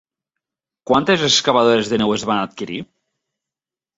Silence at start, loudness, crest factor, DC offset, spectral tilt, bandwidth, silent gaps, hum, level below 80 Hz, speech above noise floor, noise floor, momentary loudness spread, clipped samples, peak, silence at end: 0.9 s; -16 LUFS; 18 dB; under 0.1%; -3.5 dB/octave; 8 kHz; none; none; -56 dBFS; 72 dB; -89 dBFS; 14 LU; under 0.1%; -2 dBFS; 1.15 s